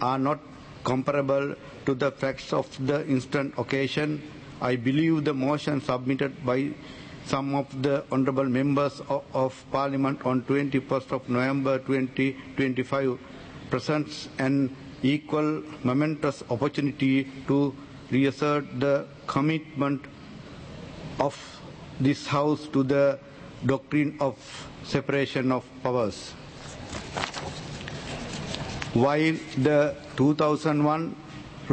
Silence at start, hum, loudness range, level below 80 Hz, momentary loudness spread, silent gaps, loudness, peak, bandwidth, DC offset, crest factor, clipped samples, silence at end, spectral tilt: 0 s; none; 4 LU; -56 dBFS; 15 LU; none; -27 LUFS; -8 dBFS; 8.8 kHz; under 0.1%; 18 dB; under 0.1%; 0 s; -6.5 dB/octave